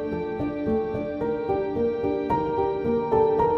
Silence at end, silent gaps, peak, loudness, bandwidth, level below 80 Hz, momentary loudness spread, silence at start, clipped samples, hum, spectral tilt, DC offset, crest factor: 0 s; none; -10 dBFS; -25 LUFS; 5.8 kHz; -46 dBFS; 7 LU; 0 s; under 0.1%; none; -9.5 dB/octave; under 0.1%; 14 dB